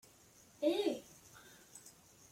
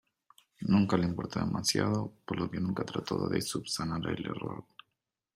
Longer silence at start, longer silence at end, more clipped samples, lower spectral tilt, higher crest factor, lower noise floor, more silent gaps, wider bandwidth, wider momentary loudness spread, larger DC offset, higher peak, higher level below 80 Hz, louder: about the same, 0.6 s vs 0.6 s; second, 0.4 s vs 0.75 s; neither; second, -3.5 dB/octave vs -5 dB/octave; about the same, 20 dB vs 18 dB; second, -64 dBFS vs -85 dBFS; neither; about the same, 16.5 kHz vs 16 kHz; first, 24 LU vs 10 LU; neither; second, -22 dBFS vs -14 dBFS; second, -80 dBFS vs -62 dBFS; second, -37 LUFS vs -32 LUFS